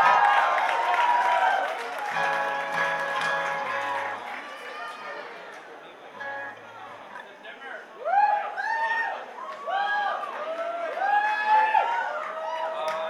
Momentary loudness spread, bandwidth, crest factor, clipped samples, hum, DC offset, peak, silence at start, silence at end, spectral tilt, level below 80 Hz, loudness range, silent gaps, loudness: 19 LU; 13.5 kHz; 20 dB; under 0.1%; none; under 0.1%; -8 dBFS; 0 s; 0 s; -2 dB/octave; -82 dBFS; 13 LU; none; -26 LUFS